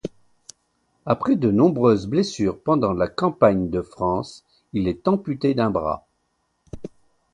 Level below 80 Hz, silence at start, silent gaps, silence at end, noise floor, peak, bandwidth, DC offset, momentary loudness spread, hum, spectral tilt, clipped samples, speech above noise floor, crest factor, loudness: -48 dBFS; 0.05 s; none; 0.45 s; -71 dBFS; -2 dBFS; 10.5 kHz; under 0.1%; 19 LU; none; -7.5 dB/octave; under 0.1%; 50 dB; 20 dB; -21 LUFS